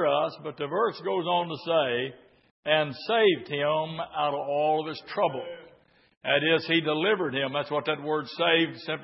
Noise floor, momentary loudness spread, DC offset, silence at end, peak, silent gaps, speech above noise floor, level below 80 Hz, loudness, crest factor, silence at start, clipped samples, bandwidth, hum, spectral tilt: -59 dBFS; 9 LU; under 0.1%; 0 s; -8 dBFS; 2.51-2.63 s, 6.17-6.21 s; 32 dB; -76 dBFS; -27 LUFS; 18 dB; 0 s; under 0.1%; 5.8 kHz; none; -9 dB/octave